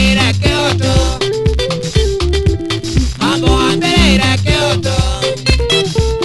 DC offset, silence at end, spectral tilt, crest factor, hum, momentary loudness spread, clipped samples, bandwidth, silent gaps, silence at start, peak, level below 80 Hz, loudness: under 0.1%; 0 s; -5 dB/octave; 12 dB; none; 5 LU; under 0.1%; 12 kHz; none; 0 s; 0 dBFS; -18 dBFS; -13 LUFS